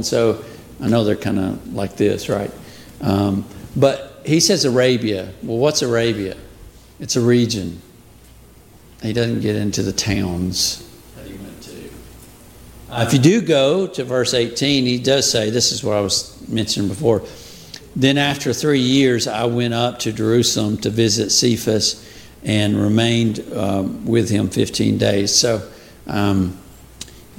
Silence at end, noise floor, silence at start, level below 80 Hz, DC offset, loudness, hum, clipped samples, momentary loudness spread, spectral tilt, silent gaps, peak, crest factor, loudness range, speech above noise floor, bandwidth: 0.15 s; -45 dBFS; 0 s; -46 dBFS; under 0.1%; -18 LUFS; none; under 0.1%; 18 LU; -4.5 dB/octave; none; 0 dBFS; 18 dB; 5 LU; 27 dB; 17 kHz